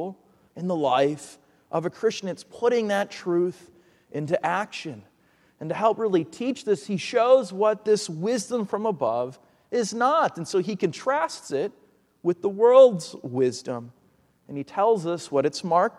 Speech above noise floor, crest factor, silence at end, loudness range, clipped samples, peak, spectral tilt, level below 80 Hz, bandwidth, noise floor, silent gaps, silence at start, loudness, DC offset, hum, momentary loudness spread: 39 dB; 20 dB; 0.1 s; 5 LU; under 0.1%; -4 dBFS; -5 dB/octave; -74 dBFS; 12 kHz; -62 dBFS; none; 0 s; -24 LUFS; under 0.1%; none; 15 LU